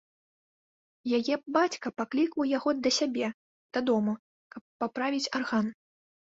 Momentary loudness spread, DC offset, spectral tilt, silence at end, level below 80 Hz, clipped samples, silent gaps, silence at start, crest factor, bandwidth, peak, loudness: 10 LU; under 0.1%; -4 dB/octave; 0.6 s; -74 dBFS; under 0.1%; 3.34-3.69 s, 4.19-4.50 s, 4.61-4.80 s; 1.05 s; 20 dB; 7.8 kHz; -12 dBFS; -30 LUFS